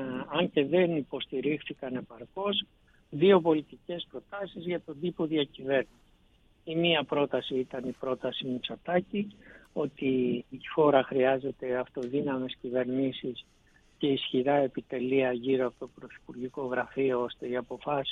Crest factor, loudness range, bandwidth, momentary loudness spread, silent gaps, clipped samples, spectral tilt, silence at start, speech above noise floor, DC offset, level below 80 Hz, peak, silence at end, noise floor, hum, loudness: 20 dB; 3 LU; 6.6 kHz; 14 LU; none; under 0.1%; -7.5 dB/octave; 0 s; 34 dB; under 0.1%; -66 dBFS; -10 dBFS; 0 s; -64 dBFS; none; -30 LUFS